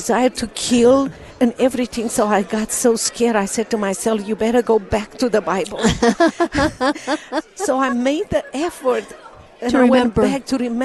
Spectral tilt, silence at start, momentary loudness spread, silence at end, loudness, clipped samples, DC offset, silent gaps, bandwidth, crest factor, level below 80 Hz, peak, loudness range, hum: -4 dB/octave; 0 s; 8 LU; 0 s; -18 LUFS; under 0.1%; under 0.1%; none; 12.5 kHz; 14 dB; -42 dBFS; -4 dBFS; 2 LU; none